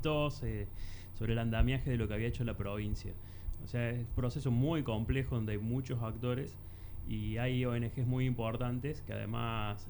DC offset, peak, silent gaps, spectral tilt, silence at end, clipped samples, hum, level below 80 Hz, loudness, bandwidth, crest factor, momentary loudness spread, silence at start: under 0.1%; -16 dBFS; none; -7.5 dB/octave; 0 s; under 0.1%; none; -44 dBFS; -36 LUFS; over 20 kHz; 18 dB; 12 LU; 0 s